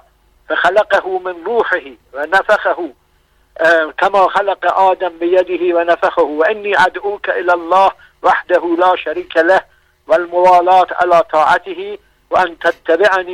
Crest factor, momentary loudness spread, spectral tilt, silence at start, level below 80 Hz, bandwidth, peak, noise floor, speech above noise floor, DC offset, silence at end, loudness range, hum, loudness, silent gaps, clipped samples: 12 dB; 8 LU; -4 dB/octave; 0.5 s; -52 dBFS; 12 kHz; -2 dBFS; -55 dBFS; 42 dB; under 0.1%; 0 s; 3 LU; none; -13 LUFS; none; under 0.1%